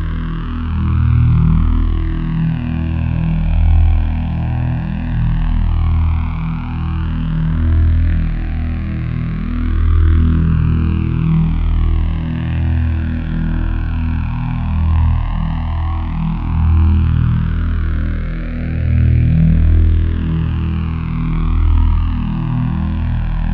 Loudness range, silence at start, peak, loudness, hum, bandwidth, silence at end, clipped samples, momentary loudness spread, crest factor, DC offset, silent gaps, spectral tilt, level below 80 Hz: 3 LU; 0 s; -2 dBFS; -17 LUFS; none; 4.3 kHz; 0 s; under 0.1%; 8 LU; 12 dB; under 0.1%; none; -10.5 dB/octave; -18 dBFS